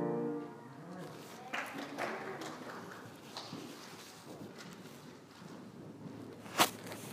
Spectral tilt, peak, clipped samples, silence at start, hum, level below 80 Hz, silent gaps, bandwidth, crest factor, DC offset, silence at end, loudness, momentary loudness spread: -3 dB/octave; -12 dBFS; under 0.1%; 0 s; none; -82 dBFS; none; 15.5 kHz; 30 dB; under 0.1%; 0 s; -42 LUFS; 17 LU